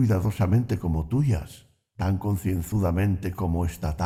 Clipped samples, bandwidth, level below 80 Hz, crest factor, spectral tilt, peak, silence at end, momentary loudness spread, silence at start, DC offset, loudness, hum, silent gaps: under 0.1%; 15.5 kHz; -38 dBFS; 14 dB; -8 dB/octave; -12 dBFS; 0 s; 5 LU; 0 s; under 0.1%; -26 LUFS; none; none